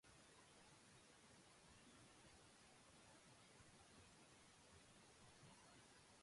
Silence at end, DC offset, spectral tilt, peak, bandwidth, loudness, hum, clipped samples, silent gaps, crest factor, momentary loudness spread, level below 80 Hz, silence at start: 0 s; under 0.1%; -3 dB/octave; -56 dBFS; 11.5 kHz; -68 LUFS; none; under 0.1%; none; 14 dB; 1 LU; -84 dBFS; 0.05 s